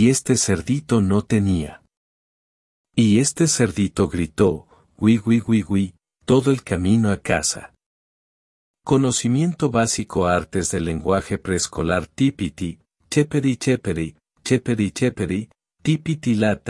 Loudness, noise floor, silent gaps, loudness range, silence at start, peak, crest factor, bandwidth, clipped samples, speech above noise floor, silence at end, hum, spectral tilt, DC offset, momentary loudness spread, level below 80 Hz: -20 LUFS; under -90 dBFS; 1.97-2.84 s, 7.86-8.74 s; 3 LU; 0 s; -2 dBFS; 18 dB; 12 kHz; under 0.1%; over 71 dB; 0 s; none; -5.5 dB/octave; under 0.1%; 9 LU; -48 dBFS